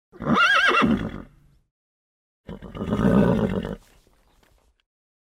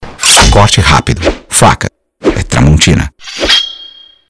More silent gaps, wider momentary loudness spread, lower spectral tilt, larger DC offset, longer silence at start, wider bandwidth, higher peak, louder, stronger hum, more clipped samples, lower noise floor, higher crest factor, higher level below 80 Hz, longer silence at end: first, 1.71-2.44 s vs none; first, 24 LU vs 12 LU; first, -6 dB/octave vs -3.5 dB/octave; neither; first, 0.2 s vs 0 s; first, 13.5 kHz vs 11 kHz; second, -6 dBFS vs 0 dBFS; second, -20 LUFS vs -7 LUFS; neither; second, under 0.1% vs 2%; first, -61 dBFS vs -34 dBFS; first, 18 dB vs 10 dB; second, -42 dBFS vs -18 dBFS; first, 1.45 s vs 0.4 s